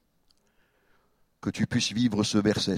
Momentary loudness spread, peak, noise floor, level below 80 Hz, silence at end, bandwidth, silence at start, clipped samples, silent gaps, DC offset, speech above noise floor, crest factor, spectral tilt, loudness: 10 LU; -10 dBFS; -68 dBFS; -58 dBFS; 0 s; 14.5 kHz; 1.45 s; under 0.1%; none; under 0.1%; 42 dB; 18 dB; -4.5 dB/octave; -27 LUFS